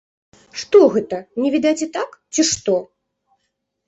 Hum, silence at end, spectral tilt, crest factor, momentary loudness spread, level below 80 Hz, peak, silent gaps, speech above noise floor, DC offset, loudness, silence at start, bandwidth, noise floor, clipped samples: none; 1.05 s; -3.5 dB/octave; 18 dB; 14 LU; -60 dBFS; -2 dBFS; none; 56 dB; under 0.1%; -18 LUFS; 0.55 s; 8.2 kHz; -74 dBFS; under 0.1%